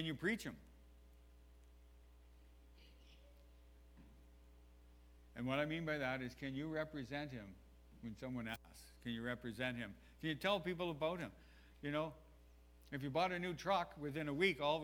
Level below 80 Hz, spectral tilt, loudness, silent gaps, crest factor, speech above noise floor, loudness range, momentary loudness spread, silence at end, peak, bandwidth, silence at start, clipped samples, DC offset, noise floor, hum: -64 dBFS; -5.5 dB/octave; -43 LUFS; none; 22 dB; 22 dB; 6 LU; 20 LU; 0 s; -22 dBFS; 17 kHz; 0 s; under 0.1%; under 0.1%; -64 dBFS; 60 Hz at -65 dBFS